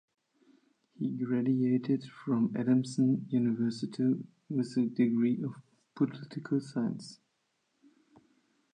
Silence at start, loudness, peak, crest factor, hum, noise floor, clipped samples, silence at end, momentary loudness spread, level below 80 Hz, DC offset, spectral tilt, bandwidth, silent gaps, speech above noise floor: 1 s; -31 LUFS; -16 dBFS; 16 dB; none; -78 dBFS; under 0.1%; 1.6 s; 9 LU; -82 dBFS; under 0.1%; -8 dB/octave; 9.6 kHz; none; 48 dB